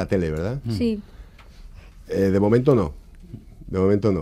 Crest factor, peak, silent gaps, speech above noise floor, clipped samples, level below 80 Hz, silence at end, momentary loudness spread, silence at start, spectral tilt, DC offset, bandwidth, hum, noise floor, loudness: 18 dB; -6 dBFS; none; 23 dB; under 0.1%; -42 dBFS; 0 s; 24 LU; 0 s; -8.5 dB/octave; under 0.1%; 14 kHz; none; -43 dBFS; -22 LUFS